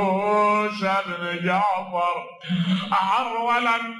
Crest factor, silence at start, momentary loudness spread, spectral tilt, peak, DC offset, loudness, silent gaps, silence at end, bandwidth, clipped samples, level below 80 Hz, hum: 14 dB; 0 s; 6 LU; -6 dB/octave; -10 dBFS; under 0.1%; -22 LUFS; none; 0 s; 12 kHz; under 0.1%; -72 dBFS; none